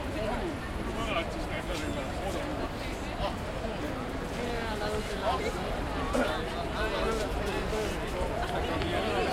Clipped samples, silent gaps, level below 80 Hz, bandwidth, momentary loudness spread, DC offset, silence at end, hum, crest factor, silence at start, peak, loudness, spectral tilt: under 0.1%; none; -40 dBFS; 16.5 kHz; 5 LU; under 0.1%; 0 s; none; 16 dB; 0 s; -16 dBFS; -32 LUFS; -5 dB/octave